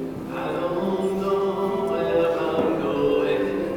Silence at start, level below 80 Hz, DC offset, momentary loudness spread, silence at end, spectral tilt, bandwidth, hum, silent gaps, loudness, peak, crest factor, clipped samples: 0 s; -52 dBFS; under 0.1%; 5 LU; 0 s; -7 dB/octave; 18 kHz; none; none; -24 LUFS; -8 dBFS; 14 dB; under 0.1%